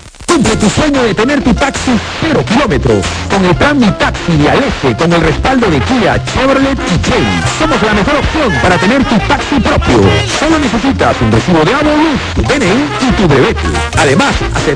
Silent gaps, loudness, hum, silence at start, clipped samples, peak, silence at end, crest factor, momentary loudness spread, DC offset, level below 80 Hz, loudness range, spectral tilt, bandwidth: none; -10 LUFS; none; 0.05 s; under 0.1%; 0 dBFS; 0 s; 10 dB; 4 LU; under 0.1%; -22 dBFS; 1 LU; -5 dB/octave; 10.5 kHz